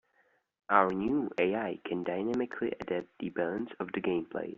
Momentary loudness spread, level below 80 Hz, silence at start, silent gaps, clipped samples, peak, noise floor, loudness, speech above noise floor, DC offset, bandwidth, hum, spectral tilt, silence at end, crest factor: 9 LU; -68 dBFS; 0.7 s; none; under 0.1%; -8 dBFS; -71 dBFS; -32 LUFS; 40 dB; under 0.1%; 7.4 kHz; none; -4.5 dB/octave; 0.05 s; 24 dB